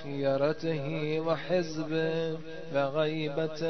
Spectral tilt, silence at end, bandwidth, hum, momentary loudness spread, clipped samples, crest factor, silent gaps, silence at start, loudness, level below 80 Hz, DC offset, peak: -6.5 dB/octave; 0 s; 6.4 kHz; none; 5 LU; under 0.1%; 16 dB; none; 0 s; -31 LUFS; -64 dBFS; 0.7%; -14 dBFS